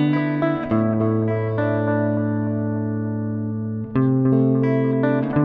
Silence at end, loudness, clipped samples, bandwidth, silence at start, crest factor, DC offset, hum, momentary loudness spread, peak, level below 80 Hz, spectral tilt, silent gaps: 0 s; -21 LUFS; under 0.1%; 4.9 kHz; 0 s; 14 dB; under 0.1%; none; 7 LU; -6 dBFS; -54 dBFS; -11.5 dB/octave; none